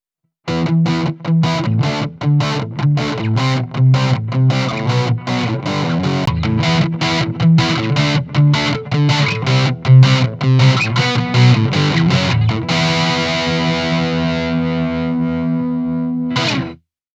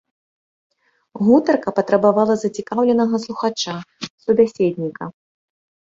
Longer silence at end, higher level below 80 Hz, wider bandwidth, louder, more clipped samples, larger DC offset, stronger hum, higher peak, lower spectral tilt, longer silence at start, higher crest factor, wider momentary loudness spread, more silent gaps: second, 0.4 s vs 0.85 s; first, -42 dBFS vs -62 dBFS; about the same, 8 kHz vs 7.8 kHz; first, -15 LUFS vs -18 LUFS; neither; neither; neither; about the same, 0 dBFS vs -2 dBFS; about the same, -6 dB/octave vs -6 dB/octave; second, 0.45 s vs 1.15 s; about the same, 14 dB vs 18 dB; second, 7 LU vs 13 LU; second, none vs 4.10-4.18 s